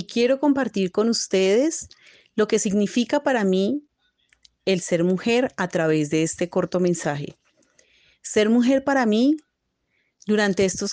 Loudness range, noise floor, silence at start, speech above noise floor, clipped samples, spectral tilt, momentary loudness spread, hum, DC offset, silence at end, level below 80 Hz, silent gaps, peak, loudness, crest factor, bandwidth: 2 LU; -74 dBFS; 0 s; 53 dB; under 0.1%; -5 dB/octave; 10 LU; none; under 0.1%; 0 s; -62 dBFS; none; -8 dBFS; -22 LUFS; 16 dB; 10 kHz